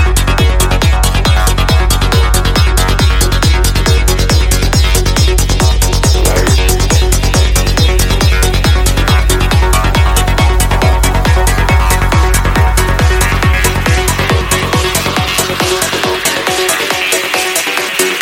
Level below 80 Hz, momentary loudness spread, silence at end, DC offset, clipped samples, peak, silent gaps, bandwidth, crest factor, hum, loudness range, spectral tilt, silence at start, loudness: -12 dBFS; 1 LU; 0 s; under 0.1%; under 0.1%; 0 dBFS; none; 17 kHz; 10 dB; none; 1 LU; -4 dB/octave; 0 s; -11 LUFS